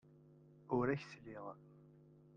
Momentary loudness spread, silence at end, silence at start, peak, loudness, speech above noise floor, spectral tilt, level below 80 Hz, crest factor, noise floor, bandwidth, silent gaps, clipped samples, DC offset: 26 LU; 0.2 s; 0.25 s; -24 dBFS; -42 LUFS; 23 dB; -8 dB/octave; -72 dBFS; 20 dB; -64 dBFS; 9 kHz; none; under 0.1%; under 0.1%